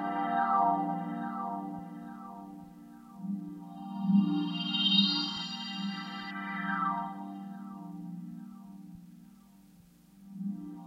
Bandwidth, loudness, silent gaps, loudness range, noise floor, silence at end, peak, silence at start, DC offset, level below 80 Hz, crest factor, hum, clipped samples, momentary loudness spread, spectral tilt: 7.8 kHz; -32 LUFS; none; 15 LU; -59 dBFS; 0 s; -12 dBFS; 0 s; under 0.1%; -74 dBFS; 22 dB; none; under 0.1%; 22 LU; -6 dB/octave